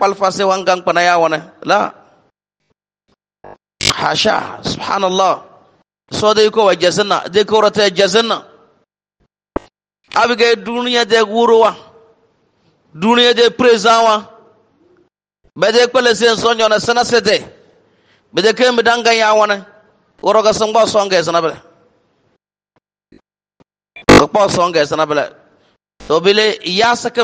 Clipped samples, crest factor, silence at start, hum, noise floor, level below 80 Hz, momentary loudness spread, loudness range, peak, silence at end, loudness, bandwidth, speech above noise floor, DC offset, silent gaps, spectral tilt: under 0.1%; 14 dB; 0 s; none; -68 dBFS; -46 dBFS; 9 LU; 4 LU; 0 dBFS; 0 s; -13 LUFS; 10 kHz; 56 dB; under 0.1%; none; -3.5 dB/octave